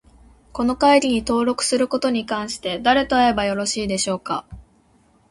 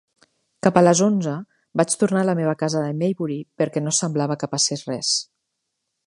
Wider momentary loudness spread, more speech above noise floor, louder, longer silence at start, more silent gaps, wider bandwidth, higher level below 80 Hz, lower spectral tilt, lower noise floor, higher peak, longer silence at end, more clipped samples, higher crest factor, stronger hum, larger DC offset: about the same, 10 LU vs 11 LU; second, 38 dB vs 57 dB; about the same, -20 LUFS vs -21 LUFS; about the same, 0.55 s vs 0.65 s; neither; about the same, 11.5 kHz vs 11.5 kHz; first, -46 dBFS vs -66 dBFS; about the same, -3.5 dB/octave vs -4.5 dB/octave; second, -57 dBFS vs -78 dBFS; second, -4 dBFS vs 0 dBFS; second, 0.7 s vs 0.85 s; neither; about the same, 18 dB vs 22 dB; neither; neither